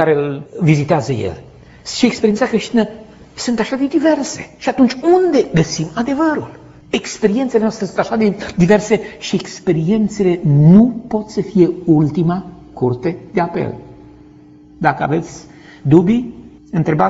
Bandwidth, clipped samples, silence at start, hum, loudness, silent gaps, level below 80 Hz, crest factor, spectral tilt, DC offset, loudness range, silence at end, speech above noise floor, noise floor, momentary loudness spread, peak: 8 kHz; under 0.1%; 0 s; none; -16 LUFS; none; -46 dBFS; 16 dB; -6.5 dB/octave; under 0.1%; 5 LU; 0 s; 27 dB; -42 dBFS; 12 LU; 0 dBFS